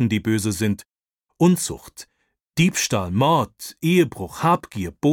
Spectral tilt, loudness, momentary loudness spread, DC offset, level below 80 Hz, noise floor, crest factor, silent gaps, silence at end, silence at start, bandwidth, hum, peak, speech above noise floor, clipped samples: -5 dB/octave; -21 LUFS; 12 LU; under 0.1%; -52 dBFS; -72 dBFS; 16 dB; none; 0 s; 0 s; 18.5 kHz; none; -6 dBFS; 51 dB; under 0.1%